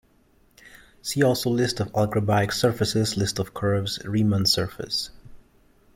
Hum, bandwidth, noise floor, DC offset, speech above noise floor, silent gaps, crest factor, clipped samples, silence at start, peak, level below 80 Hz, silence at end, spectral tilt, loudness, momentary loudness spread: none; 16.5 kHz; -60 dBFS; under 0.1%; 37 dB; none; 18 dB; under 0.1%; 0.65 s; -6 dBFS; -52 dBFS; 0.55 s; -5 dB/octave; -24 LUFS; 7 LU